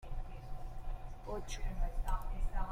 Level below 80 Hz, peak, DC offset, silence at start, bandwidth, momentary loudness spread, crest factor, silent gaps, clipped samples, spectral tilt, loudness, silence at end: -38 dBFS; -22 dBFS; under 0.1%; 0 s; 14.5 kHz; 8 LU; 14 dB; none; under 0.1%; -5 dB/octave; -45 LUFS; 0 s